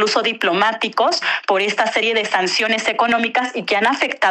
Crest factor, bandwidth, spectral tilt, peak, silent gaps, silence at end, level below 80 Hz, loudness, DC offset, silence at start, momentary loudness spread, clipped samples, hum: 12 dB; 13 kHz; -2.5 dB/octave; -4 dBFS; none; 0 s; -66 dBFS; -17 LUFS; under 0.1%; 0 s; 2 LU; under 0.1%; none